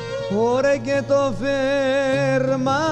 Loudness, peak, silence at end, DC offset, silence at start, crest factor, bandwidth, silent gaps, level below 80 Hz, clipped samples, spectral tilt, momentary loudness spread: -20 LUFS; -8 dBFS; 0 s; under 0.1%; 0 s; 12 dB; 10 kHz; none; -46 dBFS; under 0.1%; -5.5 dB/octave; 3 LU